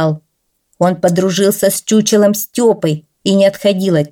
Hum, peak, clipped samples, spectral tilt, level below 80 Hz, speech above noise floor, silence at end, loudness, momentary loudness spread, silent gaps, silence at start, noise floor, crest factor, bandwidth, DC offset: none; -2 dBFS; under 0.1%; -5 dB/octave; -58 dBFS; 53 dB; 0.05 s; -13 LUFS; 6 LU; none; 0 s; -66 dBFS; 12 dB; 18.5 kHz; under 0.1%